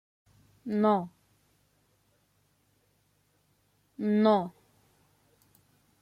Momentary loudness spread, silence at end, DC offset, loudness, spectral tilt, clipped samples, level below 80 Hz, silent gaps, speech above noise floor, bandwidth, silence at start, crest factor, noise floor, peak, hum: 21 LU; 1.5 s; under 0.1%; -28 LUFS; -8.5 dB/octave; under 0.1%; -76 dBFS; none; 45 dB; 5.6 kHz; 0.65 s; 20 dB; -71 dBFS; -12 dBFS; 50 Hz at -75 dBFS